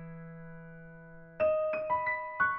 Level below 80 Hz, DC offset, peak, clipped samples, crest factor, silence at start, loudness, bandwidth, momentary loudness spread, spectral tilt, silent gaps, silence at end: -62 dBFS; under 0.1%; -18 dBFS; under 0.1%; 16 dB; 0 s; -31 LUFS; 5.4 kHz; 21 LU; -4.5 dB/octave; none; 0 s